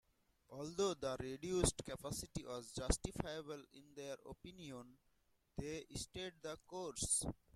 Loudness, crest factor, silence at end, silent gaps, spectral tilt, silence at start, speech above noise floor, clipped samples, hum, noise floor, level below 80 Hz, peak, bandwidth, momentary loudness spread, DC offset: -44 LUFS; 26 dB; 0.2 s; none; -3.5 dB/octave; 0.5 s; 34 dB; under 0.1%; none; -78 dBFS; -56 dBFS; -18 dBFS; 15 kHz; 16 LU; under 0.1%